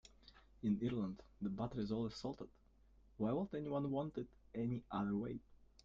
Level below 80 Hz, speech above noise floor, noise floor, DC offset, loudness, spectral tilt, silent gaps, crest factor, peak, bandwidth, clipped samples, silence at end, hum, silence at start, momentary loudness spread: -66 dBFS; 27 dB; -68 dBFS; under 0.1%; -43 LUFS; -7.5 dB/octave; none; 16 dB; -28 dBFS; 7.6 kHz; under 0.1%; 0.2 s; none; 0.05 s; 10 LU